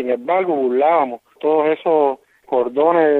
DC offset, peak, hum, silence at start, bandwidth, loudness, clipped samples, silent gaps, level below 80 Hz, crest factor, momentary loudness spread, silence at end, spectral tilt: under 0.1%; -2 dBFS; none; 0 s; 4.1 kHz; -17 LUFS; under 0.1%; none; -72 dBFS; 14 dB; 7 LU; 0 s; -8 dB/octave